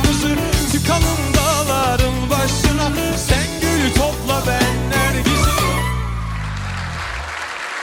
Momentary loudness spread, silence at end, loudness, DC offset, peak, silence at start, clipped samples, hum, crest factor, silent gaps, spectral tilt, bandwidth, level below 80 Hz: 9 LU; 0 s; -18 LUFS; under 0.1%; -2 dBFS; 0 s; under 0.1%; none; 14 dB; none; -4 dB/octave; 17 kHz; -24 dBFS